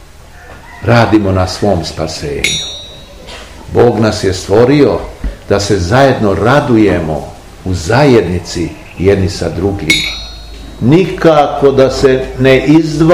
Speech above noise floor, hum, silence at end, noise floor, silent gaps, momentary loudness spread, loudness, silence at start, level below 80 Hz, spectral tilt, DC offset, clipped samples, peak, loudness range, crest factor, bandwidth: 25 dB; none; 0 s; -34 dBFS; none; 17 LU; -11 LUFS; 0.35 s; -30 dBFS; -5.5 dB/octave; 0.7%; 2%; 0 dBFS; 4 LU; 10 dB; 16 kHz